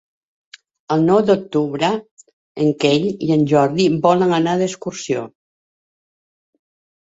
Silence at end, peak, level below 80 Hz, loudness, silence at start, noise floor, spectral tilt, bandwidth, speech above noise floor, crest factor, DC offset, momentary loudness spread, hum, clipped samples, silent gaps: 1.8 s; -2 dBFS; -58 dBFS; -17 LUFS; 0.9 s; under -90 dBFS; -6 dB/octave; 8 kHz; over 74 dB; 18 dB; under 0.1%; 10 LU; none; under 0.1%; 2.11-2.17 s, 2.33-2.55 s